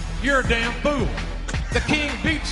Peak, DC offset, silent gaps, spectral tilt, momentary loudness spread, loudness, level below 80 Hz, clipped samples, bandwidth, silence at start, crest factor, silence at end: -6 dBFS; under 0.1%; none; -4.5 dB/octave; 9 LU; -22 LUFS; -28 dBFS; under 0.1%; 11.5 kHz; 0 s; 16 dB; 0 s